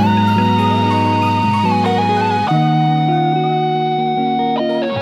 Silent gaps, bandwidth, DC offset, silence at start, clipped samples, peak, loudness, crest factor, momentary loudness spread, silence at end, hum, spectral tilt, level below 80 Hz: none; 12 kHz; under 0.1%; 0 s; under 0.1%; -4 dBFS; -15 LUFS; 12 dB; 3 LU; 0 s; none; -7.5 dB/octave; -54 dBFS